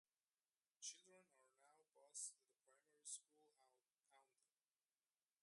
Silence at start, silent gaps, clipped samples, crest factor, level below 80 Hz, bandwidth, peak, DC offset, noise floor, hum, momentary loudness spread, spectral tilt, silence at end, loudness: 0.8 s; none; under 0.1%; 26 dB; under -90 dBFS; 11.5 kHz; -40 dBFS; under 0.1%; under -90 dBFS; none; 7 LU; 2 dB/octave; 1.2 s; -56 LUFS